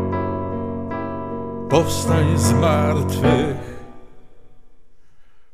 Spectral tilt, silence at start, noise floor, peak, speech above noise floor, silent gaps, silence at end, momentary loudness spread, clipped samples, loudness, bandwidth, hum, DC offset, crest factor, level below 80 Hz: -6 dB/octave; 0 s; -49 dBFS; -2 dBFS; 32 dB; none; 0.1 s; 12 LU; under 0.1%; -20 LUFS; 15.5 kHz; none; 1%; 18 dB; -40 dBFS